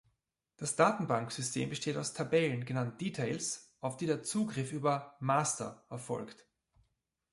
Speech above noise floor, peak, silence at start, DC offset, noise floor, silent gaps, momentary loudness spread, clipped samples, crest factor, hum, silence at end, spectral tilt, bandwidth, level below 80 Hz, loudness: 48 dB; -12 dBFS; 0.6 s; under 0.1%; -82 dBFS; none; 11 LU; under 0.1%; 22 dB; none; 1 s; -4.5 dB/octave; 11.5 kHz; -74 dBFS; -34 LUFS